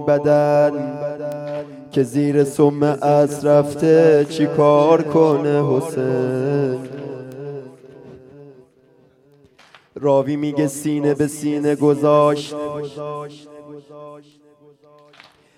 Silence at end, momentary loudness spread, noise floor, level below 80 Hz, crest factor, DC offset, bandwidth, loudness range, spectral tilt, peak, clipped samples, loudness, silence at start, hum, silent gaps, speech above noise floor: 1.4 s; 18 LU; -54 dBFS; -64 dBFS; 16 dB; under 0.1%; 14.5 kHz; 11 LU; -7 dB/octave; -2 dBFS; under 0.1%; -17 LUFS; 0 s; none; none; 37 dB